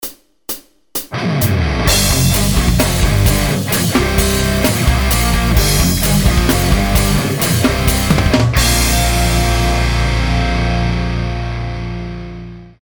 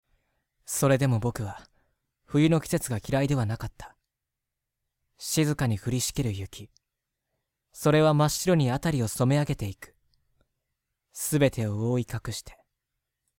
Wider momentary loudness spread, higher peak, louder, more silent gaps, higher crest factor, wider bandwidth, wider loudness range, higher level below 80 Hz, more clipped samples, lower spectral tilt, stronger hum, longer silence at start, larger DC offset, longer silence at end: second, 12 LU vs 15 LU; first, 0 dBFS vs -10 dBFS; first, -14 LUFS vs -26 LUFS; neither; about the same, 14 dB vs 18 dB; first, over 20 kHz vs 17 kHz; second, 2 LU vs 5 LU; first, -18 dBFS vs -52 dBFS; neither; about the same, -4.5 dB/octave vs -5.5 dB/octave; neither; second, 0 s vs 0.7 s; first, 0.3% vs under 0.1%; second, 0.15 s vs 0.85 s